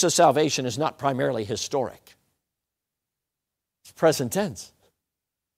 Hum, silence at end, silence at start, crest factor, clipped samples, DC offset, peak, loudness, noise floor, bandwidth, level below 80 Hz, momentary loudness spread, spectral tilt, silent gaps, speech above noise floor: none; 0.9 s; 0 s; 22 dB; under 0.1%; under 0.1%; -4 dBFS; -24 LUFS; -86 dBFS; 16 kHz; -66 dBFS; 13 LU; -4 dB/octave; none; 63 dB